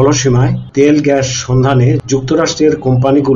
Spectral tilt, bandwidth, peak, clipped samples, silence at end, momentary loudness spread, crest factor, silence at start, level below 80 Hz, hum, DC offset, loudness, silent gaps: -6 dB/octave; 7.6 kHz; 0 dBFS; under 0.1%; 0 s; 4 LU; 10 dB; 0 s; -36 dBFS; none; under 0.1%; -11 LUFS; none